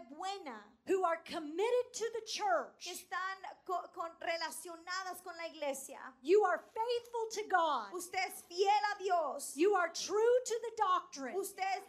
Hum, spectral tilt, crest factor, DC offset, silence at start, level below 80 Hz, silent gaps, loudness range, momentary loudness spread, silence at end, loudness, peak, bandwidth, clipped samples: none; -1 dB/octave; 18 dB; under 0.1%; 0 s; -84 dBFS; none; 6 LU; 13 LU; 0 s; -36 LUFS; -18 dBFS; 15 kHz; under 0.1%